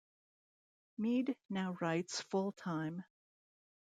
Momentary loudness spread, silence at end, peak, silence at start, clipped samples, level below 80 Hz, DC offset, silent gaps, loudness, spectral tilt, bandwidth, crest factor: 7 LU; 0.9 s; -24 dBFS; 1 s; under 0.1%; -86 dBFS; under 0.1%; 1.45-1.49 s; -39 LUFS; -5.5 dB/octave; 9.4 kHz; 18 dB